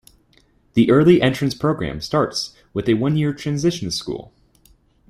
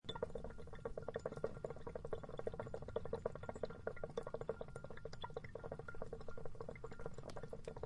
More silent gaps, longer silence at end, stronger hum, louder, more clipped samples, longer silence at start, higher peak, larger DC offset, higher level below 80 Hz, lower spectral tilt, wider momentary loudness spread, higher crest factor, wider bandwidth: neither; first, 0.85 s vs 0 s; neither; first, -19 LUFS vs -49 LUFS; neither; first, 0.75 s vs 0.05 s; first, -2 dBFS vs -26 dBFS; neither; first, -48 dBFS vs -58 dBFS; about the same, -6 dB/octave vs -6.5 dB/octave; first, 12 LU vs 6 LU; about the same, 18 dB vs 22 dB; first, 14.5 kHz vs 11 kHz